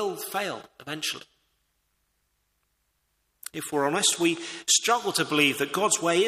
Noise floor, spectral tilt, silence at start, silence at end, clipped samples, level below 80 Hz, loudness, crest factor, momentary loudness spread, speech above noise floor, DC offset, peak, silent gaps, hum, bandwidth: -74 dBFS; -2 dB/octave; 0 s; 0 s; under 0.1%; -72 dBFS; -25 LUFS; 20 dB; 16 LU; 48 dB; under 0.1%; -8 dBFS; none; none; 15.5 kHz